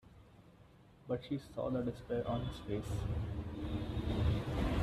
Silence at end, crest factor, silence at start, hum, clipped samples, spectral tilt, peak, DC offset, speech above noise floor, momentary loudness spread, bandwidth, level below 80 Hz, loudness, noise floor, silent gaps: 0 s; 16 dB; 0.05 s; none; under 0.1%; -7.5 dB/octave; -22 dBFS; under 0.1%; 23 dB; 7 LU; 13.5 kHz; -46 dBFS; -39 LUFS; -62 dBFS; none